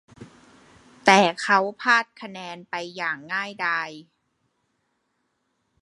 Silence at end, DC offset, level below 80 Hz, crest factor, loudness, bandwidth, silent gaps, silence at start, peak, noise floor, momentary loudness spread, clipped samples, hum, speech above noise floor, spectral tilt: 1.8 s; under 0.1%; -72 dBFS; 26 dB; -22 LUFS; 11.5 kHz; none; 0.2 s; 0 dBFS; -74 dBFS; 19 LU; under 0.1%; none; 50 dB; -3.5 dB/octave